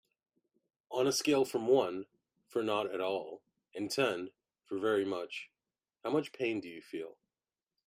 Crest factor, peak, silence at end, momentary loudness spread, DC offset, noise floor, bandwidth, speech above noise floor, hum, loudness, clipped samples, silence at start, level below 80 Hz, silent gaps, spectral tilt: 20 dB; -16 dBFS; 0.75 s; 18 LU; under 0.1%; under -90 dBFS; 15.5 kHz; over 57 dB; none; -34 LUFS; under 0.1%; 0.9 s; -82 dBFS; none; -4 dB/octave